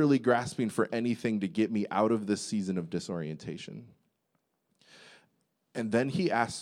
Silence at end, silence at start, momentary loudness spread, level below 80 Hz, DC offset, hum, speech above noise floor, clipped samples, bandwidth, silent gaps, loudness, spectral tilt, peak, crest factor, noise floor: 0 s; 0 s; 12 LU; -74 dBFS; under 0.1%; none; 48 dB; under 0.1%; 13.5 kHz; none; -31 LUFS; -6 dB/octave; -12 dBFS; 20 dB; -78 dBFS